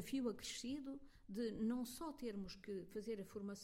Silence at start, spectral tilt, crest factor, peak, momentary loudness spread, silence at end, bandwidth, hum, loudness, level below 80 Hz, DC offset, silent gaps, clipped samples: 0 s; -4.5 dB/octave; 16 dB; -32 dBFS; 8 LU; 0 s; 16.5 kHz; none; -47 LUFS; -68 dBFS; under 0.1%; none; under 0.1%